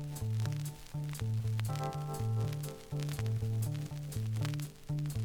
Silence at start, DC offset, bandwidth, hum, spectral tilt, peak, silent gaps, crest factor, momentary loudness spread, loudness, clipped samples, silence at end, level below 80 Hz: 0 s; under 0.1%; 20 kHz; none; -6.5 dB/octave; -18 dBFS; none; 18 dB; 6 LU; -37 LUFS; under 0.1%; 0 s; -54 dBFS